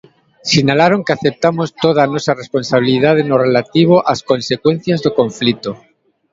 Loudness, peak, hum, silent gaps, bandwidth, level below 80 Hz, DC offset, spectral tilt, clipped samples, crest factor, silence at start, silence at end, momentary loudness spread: -14 LUFS; 0 dBFS; none; none; 7.8 kHz; -54 dBFS; under 0.1%; -5.5 dB/octave; under 0.1%; 14 dB; 0.45 s; 0.55 s; 6 LU